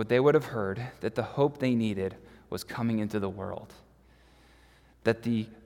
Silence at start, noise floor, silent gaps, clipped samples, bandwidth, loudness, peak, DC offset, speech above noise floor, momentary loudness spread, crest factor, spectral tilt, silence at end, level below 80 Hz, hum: 0 s; -59 dBFS; none; under 0.1%; 17 kHz; -30 LUFS; -10 dBFS; under 0.1%; 30 dB; 14 LU; 20 dB; -7 dB/octave; 0.1 s; -62 dBFS; none